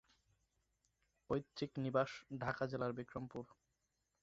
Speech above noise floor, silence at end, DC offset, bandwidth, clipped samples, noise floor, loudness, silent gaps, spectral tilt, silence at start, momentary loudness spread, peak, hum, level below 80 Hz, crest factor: 44 dB; 0.7 s; under 0.1%; 7.6 kHz; under 0.1%; -86 dBFS; -43 LUFS; none; -5.5 dB/octave; 1.3 s; 11 LU; -22 dBFS; none; -72 dBFS; 22 dB